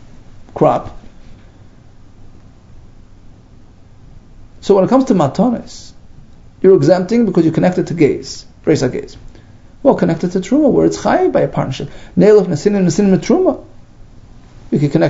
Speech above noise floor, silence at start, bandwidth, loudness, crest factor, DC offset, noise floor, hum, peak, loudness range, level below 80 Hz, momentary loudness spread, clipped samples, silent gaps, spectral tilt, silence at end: 28 dB; 0 s; 8 kHz; -13 LUFS; 16 dB; under 0.1%; -40 dBFS; none; 0 dBFS; 6 LU; -40 dBFS; 15 LU; under 0.1%; none; -7 dB/octave; 0 s